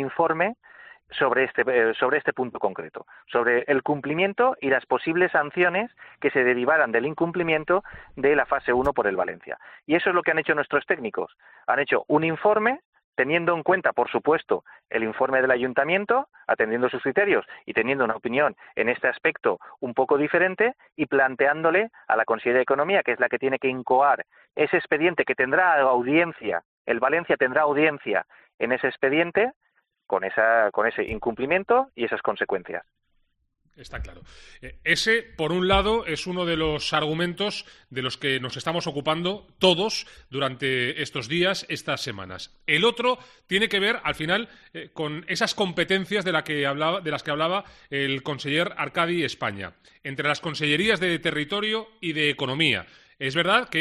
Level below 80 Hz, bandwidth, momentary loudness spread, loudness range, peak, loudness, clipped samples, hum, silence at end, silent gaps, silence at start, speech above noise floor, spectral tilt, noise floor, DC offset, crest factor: -52 dBFS; 12 kHz; 10 LU; 4 LU; -4 dBFS; -24 LUFS; under 0.1%; none; 0 s; 12.85-12.93 s, 13.04-13.13 s, 26.65-26.85 s, 28.54-28.58 s, 29.56-29.61 s; 0 s; 45 dB; -4.5 dB/octave; -70 dBFS; under 0.1%; 20 dB